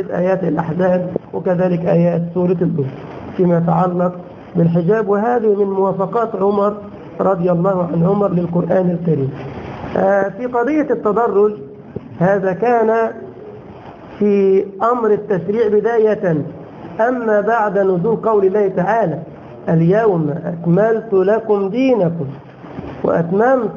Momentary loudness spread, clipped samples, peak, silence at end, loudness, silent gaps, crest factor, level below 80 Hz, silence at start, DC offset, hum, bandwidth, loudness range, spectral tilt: 15 LU; under 0.1%; -2 dBFS; 0 s; -16 LUFS; none; 14 dB; -50 dBFS; 0 s; under 0.1%; none; 6.8 kHz; 2 LU; -10 dB/octave